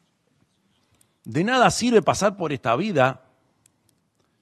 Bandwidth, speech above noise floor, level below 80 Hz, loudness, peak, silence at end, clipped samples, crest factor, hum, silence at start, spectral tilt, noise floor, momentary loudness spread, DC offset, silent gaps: 12.5 kHz; 47 dB; -58 dBFS; -21 LUFS; -2 dBFS; 1.25 s; under 0.1%; 22 dB; none; 1.25 s; -4.5 dB/octave; -68 dBFS; 8 LU; under 0.1%; none